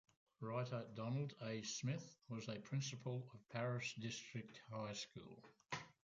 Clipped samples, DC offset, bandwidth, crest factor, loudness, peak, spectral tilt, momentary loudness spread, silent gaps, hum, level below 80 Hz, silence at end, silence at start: under 0.1%; under 0.1%; 7.8 kHz; 18 dB; -48 LUFS; -30 dBFS; -5 dB/octave; 8 LU; none; none; -82 dBFS; 0.25 s; 0.4 s